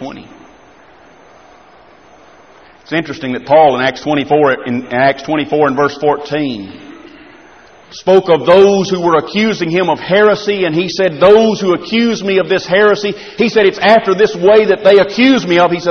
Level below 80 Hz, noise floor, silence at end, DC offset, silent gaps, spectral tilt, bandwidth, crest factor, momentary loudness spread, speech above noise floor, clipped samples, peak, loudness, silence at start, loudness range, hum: -50 dBFS; -42 dBFS; 0 s; 0.2%; none; -5.5 dB/octave; 6.6 kHz; 12 dB; 10 LU; 31 dB; under 0.1%; 0 dBFS; -11 LUFS; 0 s; 6 LU; none